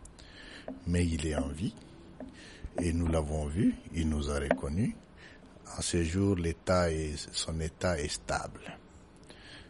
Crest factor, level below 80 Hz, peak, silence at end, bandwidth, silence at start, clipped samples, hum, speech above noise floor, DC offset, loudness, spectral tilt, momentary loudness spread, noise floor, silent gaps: 24 dB; -42 dBFS; -10 dBFS; 0 s; 11.5 kHz; 0 s; under 0.1%; none; 23 dB; under 0.1%; -32 LUFS; -5.5 dB/octave; 22 LU; -55 dBFS; none